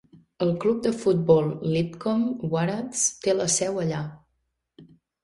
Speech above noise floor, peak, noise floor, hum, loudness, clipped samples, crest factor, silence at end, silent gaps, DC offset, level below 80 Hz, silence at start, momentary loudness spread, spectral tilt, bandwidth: 52 dB; -6 dBFS; -76 dBFS; none; -24 LUFS; under 0.1%; 20 dB; 0.4 s; none; under 0.1%; -62 dBFS; 0.15 s; 7 LU; -5 dB/octave; 11.5 kHz